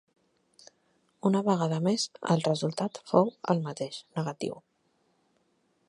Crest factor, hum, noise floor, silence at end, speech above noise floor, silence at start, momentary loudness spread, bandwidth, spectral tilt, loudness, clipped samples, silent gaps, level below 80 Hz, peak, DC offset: 24 dB; none; -72 dBFS; 1.3 s; 44 dB; 1.25 s; 10 LU; 11.5 kHz; -6 dB/octave; -29 LUFS; under 0.1%; none; -78 dBFS; -6 dBFS; under 0.1%